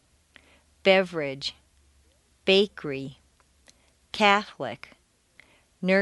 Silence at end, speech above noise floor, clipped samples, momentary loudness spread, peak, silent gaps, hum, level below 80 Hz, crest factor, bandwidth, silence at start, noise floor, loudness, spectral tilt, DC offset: 0 s; 38 dB; under 0.1%; 15 LU; -4 dBFS; none; none; -64 dBFS; 24 dB; 11.5 kHz; 0.85 s; -63 dBFS; -25 LUFS; -5 dB/octave; under 0.1%